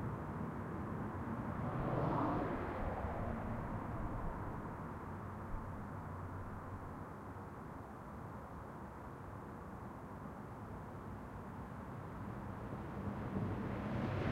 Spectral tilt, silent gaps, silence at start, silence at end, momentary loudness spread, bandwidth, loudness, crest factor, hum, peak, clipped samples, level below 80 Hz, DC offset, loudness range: -8.5 dB/octave; none; 0 s; 0 s; 10 LU; 16 kHz; -44 LUFS; 18 dB; none; -24 dBFS; under 0.1%; -54 dBFS; under 0.1%; 9 LU